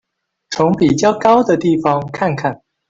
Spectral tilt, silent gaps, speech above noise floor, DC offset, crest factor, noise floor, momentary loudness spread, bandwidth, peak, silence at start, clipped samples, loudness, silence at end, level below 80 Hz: -6 dB/octave; none; 22 dB; under 0.1%; 14 dB; -36 dBFS; 9 LU; 7.8 kHz; -2 dBFS; 0.5 s; under 0.1%; -15 LUFS; 0.35 s; -50 dBFS